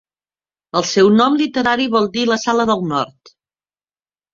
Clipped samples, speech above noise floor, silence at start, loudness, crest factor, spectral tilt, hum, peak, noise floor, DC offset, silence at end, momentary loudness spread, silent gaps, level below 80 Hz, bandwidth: under 0.1%; over 75 dB; 0.75 s; -16 LUFS; 16 dB; -4.5 dB/octave; none; -2 dBFS; under -90 dBFS; under 0.1%; 1.25 s; 9 LU; none; -56 dBFS; 7.6 kHz